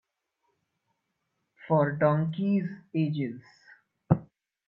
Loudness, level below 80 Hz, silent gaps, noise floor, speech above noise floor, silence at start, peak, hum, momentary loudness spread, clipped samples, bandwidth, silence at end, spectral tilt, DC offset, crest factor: -28 LUFS; -66 dBFS; none; -80 dBFS; 53 dB; 1.6 s; -6 dBFS; none; 9 LU; under 0.1%; 5.6 kHz; 0.45 s; -10.5 dB/octave; under 0.1%; 24 dB